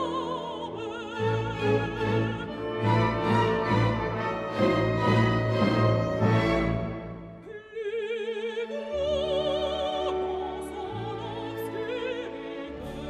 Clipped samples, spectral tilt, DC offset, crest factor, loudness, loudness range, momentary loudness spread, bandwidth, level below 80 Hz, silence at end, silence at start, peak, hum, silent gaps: under 0.1%; -7 dB/octave; under 0.1%; 16 dB; -28 LUFS; 6 LU; 11 LU; 13 kHz; -46 dBFS; 0 s; 0 s; -10 dBFS; none; none